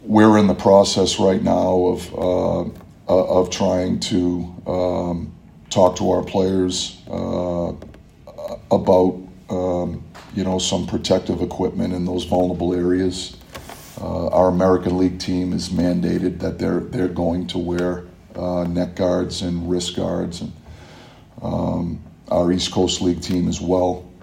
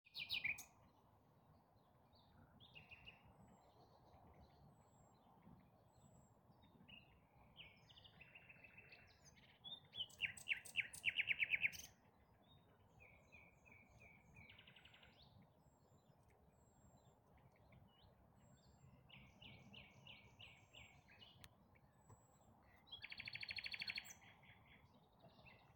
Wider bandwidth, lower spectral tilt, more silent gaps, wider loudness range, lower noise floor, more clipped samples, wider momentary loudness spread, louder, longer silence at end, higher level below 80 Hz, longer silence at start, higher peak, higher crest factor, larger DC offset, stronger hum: about the same, 16 kHz vs 17 kHz; first, -5.5 dB/octave vs -1.5 dB/octave; neither; second, 4 LU vs 23 LU; second, -44 dBFS vs -74 dBFS; neither; second, 13 LU vs 26 LU; first, -20 LUFS vs -46 LUFS; about the same, 0.1 s vs 0 s; first, -46 dBFS vs -80 dBFS; about the same, 0 s vs 0.05 s; first, 0 dBFS vs -28 dBFS; second, 20 dB vs 26 dB; neither; neither